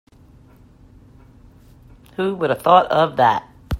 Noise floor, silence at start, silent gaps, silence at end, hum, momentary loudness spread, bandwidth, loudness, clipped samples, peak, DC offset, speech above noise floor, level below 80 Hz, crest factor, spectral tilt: -48 dBFS; 2.2 s; none; 0 s; none; 11 LU; 16 kHz; -17 LUFS; under 0.1%; 0 dBFS; under 0.1%; 32 dB; -48 dBFS; 20 dB; -6.5 dB/octave